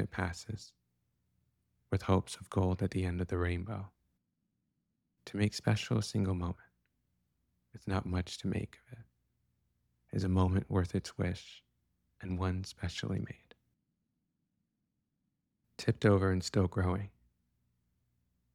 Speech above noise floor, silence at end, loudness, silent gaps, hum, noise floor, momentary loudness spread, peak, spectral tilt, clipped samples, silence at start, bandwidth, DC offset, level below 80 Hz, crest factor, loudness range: 50 dB; 1.45 s; -35 LUFS; none; none; -84 dBFS; 16 LU; -14 dBFS; -6.5 dB/octave; under 0.1%; 0 s; 12 kHz; under 0.1%; -56 dBFS; 22 dB; 7 LU